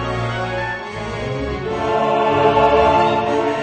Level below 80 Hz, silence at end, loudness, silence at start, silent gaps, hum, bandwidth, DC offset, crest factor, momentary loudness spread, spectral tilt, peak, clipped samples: -36 dBFS; 0 s; -18 LUFS; 0 s; none; none; 9 kHz; under 0.1%; 16 dB; 11 LU; -6 dB/octave; -2 dBFS; under 0.1%